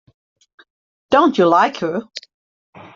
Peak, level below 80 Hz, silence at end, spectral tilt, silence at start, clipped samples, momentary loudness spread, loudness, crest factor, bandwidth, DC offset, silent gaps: -2 dBFS; -62 dBFS; 0.75 s; -5.5 dB/octave; 1.1 s; under 0.1%; 19 LU; -16 LUFS; 18 dB; 7.6 kHz; under 0.1%; none